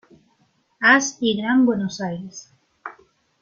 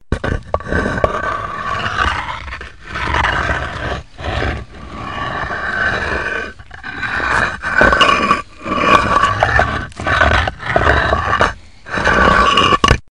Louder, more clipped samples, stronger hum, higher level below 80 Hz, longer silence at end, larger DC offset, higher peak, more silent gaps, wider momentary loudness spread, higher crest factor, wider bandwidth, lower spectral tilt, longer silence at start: second, -19 LUFS vs -15 LUFS; neither; neither; second, -64 dBFS vs -28 dBFS; first, 0.5 s vs 0.1 s; second, under 0.1% vs 0.9%; about the same, -2 dBFS vs 0 dBFS; neither; first, 24 LU vs 14 LU; about the same, 20 dB vs 16 dB; second, 7.2 kHz vs 11 kHz; about the same, -3.5 dB/octave vs -4.5 dB/octave; first, 0.8 s vs 0.1 s